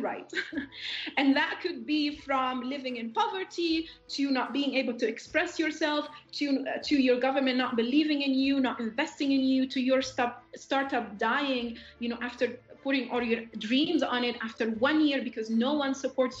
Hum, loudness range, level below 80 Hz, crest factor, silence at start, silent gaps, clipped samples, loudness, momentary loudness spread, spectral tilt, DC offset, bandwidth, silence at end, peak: none; 3 LU; -66 dBFS; 18 dB; 0 s; none; under 0.1%; -29 LUFS; 8 LU; -4 dB/octave; under 0.1%; 8 kHz; 0 s; -12 dBFS